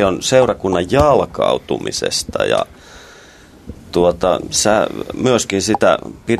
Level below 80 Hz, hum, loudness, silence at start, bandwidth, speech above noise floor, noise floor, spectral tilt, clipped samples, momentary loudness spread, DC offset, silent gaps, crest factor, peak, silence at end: -40 dBFS; none; -16 LUFS; 0 s; 14 kHz; 27 dB; -42 dBFS; -4 dB/octave; under 0.1%; 6 LU; under 0.1%; none; 16 dB; 0 dBFS; 0 s